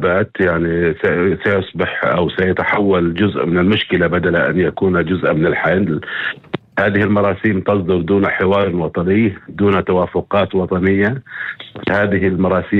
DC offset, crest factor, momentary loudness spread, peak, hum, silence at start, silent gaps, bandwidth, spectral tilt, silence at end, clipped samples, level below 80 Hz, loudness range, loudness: under 0.1%; 14 dB; 5 LU; -2 dBFS; none; 0 s; none; 4.9 kHz; -9 dB/octave; 0 s; under 0.1%; -44 dBFS; 1 LU; -16 LUFS